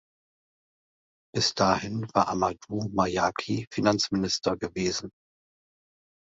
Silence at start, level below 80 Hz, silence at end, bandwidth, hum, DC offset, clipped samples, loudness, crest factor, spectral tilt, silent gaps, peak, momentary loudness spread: 1.35 s; -56 dBFS; 1.15 s; 8.2 kHz; none; under 0.1%; under 0.1%; -27 LUFS; 24 dB; -4.5 dB/octave; 3.67-3.71 s; -6 dBFS; 7 LU